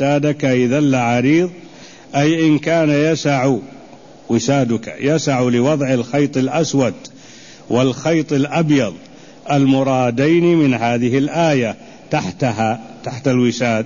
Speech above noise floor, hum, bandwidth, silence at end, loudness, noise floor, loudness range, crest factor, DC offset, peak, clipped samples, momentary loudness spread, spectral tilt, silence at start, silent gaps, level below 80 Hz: 25 dB; none; 7.4 kHz; 0 s; -16 LUFS; -40 dBFS; 2 LU; 12 dB; 0.3%; -4 dBFS; under 0.1%; 8 LU; -6 dB/octave; 0 s; none; -54 dBFS